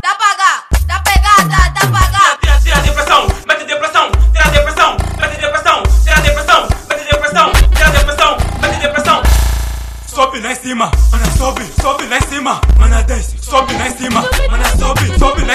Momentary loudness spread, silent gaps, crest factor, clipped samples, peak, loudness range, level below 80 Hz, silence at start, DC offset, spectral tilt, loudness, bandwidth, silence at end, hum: 7 LU; none; 10 dB; 0.8%; 0 dBFS; 3 LU; -14 dBFS; 0.05 s; under 0.1%; -4 dB/octave; -11 LUFS; 14.5 kHz; 0 s; none